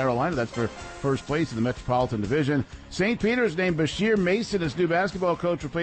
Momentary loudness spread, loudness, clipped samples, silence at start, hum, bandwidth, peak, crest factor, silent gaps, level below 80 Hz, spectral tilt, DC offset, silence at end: 5 LU; -25 LUFS; under 0.1%; 0 s; none; 8.8 kHz; -12 dBFS; 12 dB; none; -48 dBFS; -6 dB/octave; under 0.1%; 0 s